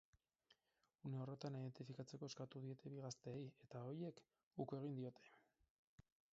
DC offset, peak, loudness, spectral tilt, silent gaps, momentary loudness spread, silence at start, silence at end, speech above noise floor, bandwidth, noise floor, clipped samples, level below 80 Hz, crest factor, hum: under 0.1%; -34 dBFS; -53 LUFS; -7.5 dB/octave; 4.43-4.51 s, 5.70-5.98 s; 6 LU; 0.5 s; 0.3 s; 36 dB; 7.6 kHz; -88 dBFS; under 0.1%; -88 dBFS; 20 dB; none